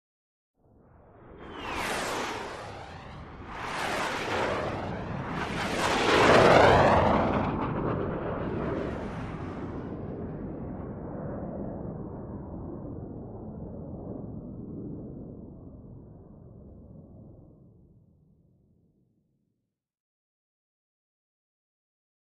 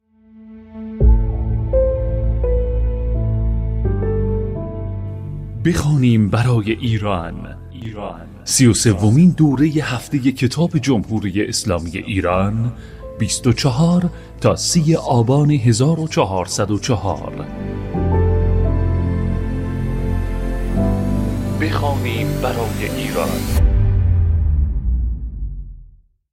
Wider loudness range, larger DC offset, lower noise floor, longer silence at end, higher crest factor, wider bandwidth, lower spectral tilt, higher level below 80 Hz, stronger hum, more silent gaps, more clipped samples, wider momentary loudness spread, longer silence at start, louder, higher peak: first, 19 LU vs 4 LU; neither; first, -83 dBFS vs -46 dBFS; first, 4.9 s vs 0.45 s; first, 24 dB vs 16 dB; second, 14 kHz vs 16 kHz; about the same, -5.5 dB/octave vs -6 dB/octave; second, -48 dBFS vs -24 dBFS; neither; neither; neither; first, 23 LU vs 13 LU; first, 1.15 s vs 0.35 s; second, -28 LUFS vs -18 LUFS; second, -8 dBFS vs -2 dBFS